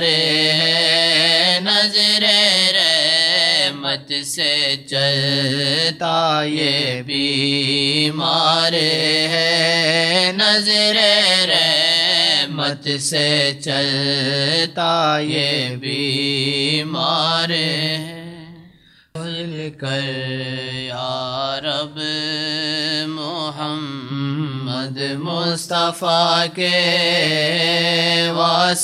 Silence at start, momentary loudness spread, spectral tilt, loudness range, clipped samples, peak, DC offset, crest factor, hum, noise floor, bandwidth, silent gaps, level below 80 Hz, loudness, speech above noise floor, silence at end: 0 s; 11 LU; -3 dB/octave; 9 LU; under 0.1%; 0 dBFS; under 0.1%; 18 dB; none; -49 dBFS; 15 kHz; none; -64 dBFS; -16 LUFS; 31 dB; 0 s